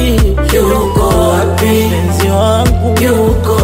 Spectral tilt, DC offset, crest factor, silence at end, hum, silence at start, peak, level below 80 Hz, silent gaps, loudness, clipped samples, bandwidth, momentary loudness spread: -6 dB/octave; under 0.1%; 10 dB; 0 s; none; 0 s; 0 dBFS; -16 dBFS; none; -11 LUFS; under 0.1%; 16.5 kHz; 1 LU